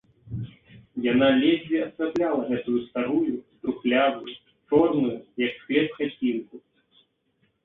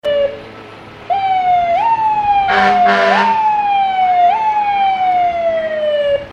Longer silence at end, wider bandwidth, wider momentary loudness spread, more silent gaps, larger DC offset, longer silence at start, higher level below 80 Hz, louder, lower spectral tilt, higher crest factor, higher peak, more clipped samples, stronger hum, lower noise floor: first, 1.05 s vs 0 s; second, 4.2 kHz vs 8.4 kHz; first, 16 LU vs 7 LU; neither; neither; first, 0.25 s vs 0.05 s; second, -60 dBFS vs -46 dBFS; second, -25 LUFS vs -13 LUFS; first, -8 dB/octave vs -4.5 dB/octave; about the same, 18 dB vs 14 dB; second, -8 dBFS vs 0 dBFS; neither; neither; first, -70 dBFS vs -34 dBFS